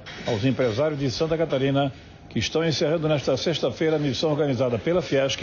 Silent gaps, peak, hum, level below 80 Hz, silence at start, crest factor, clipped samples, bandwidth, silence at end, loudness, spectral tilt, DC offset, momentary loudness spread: none; -12 dBFS; none; -52 dBFS; 0 s; 12 dB; under 0.1%; 7.2 kHz; 0 s; -24 LUFS; -5 dB/octave; under 0.1%; 3 LU